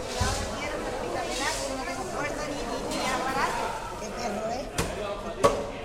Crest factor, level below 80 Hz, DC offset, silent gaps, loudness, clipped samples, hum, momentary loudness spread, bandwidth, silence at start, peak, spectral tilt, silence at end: 24 dB; -42 dBFS; under 0.1%; none; -30 LUFS; under 0.1%; none; 7 LU; 16 kHz; 0 s; -6 dBFS; -3.5 dB/octave; 0 s